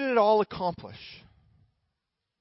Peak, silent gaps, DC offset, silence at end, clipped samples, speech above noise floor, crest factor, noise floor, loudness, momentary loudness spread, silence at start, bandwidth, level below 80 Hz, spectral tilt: -12 dBFS; none; under 0.1%; 1.25 s; under 0.1%; 57 dB; 18 dB; -84 dBFS; -26 LUFS; 23 LU; 0 s; 5.8 kHz; -64 dBFS; -9 dB/octave